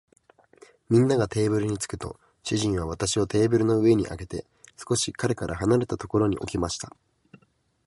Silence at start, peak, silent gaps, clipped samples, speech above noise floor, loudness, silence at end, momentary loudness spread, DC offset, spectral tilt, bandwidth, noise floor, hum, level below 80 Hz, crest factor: 0.9 s; -8 dBFS; none; under 0.1%; 41 dB; -25 LUFS; 0.95 s; 15 LU; under 0.1%; -5.5 dB/octave; 11.5 kHz; -65 dBFS; none; -48 dBFS; 18 dB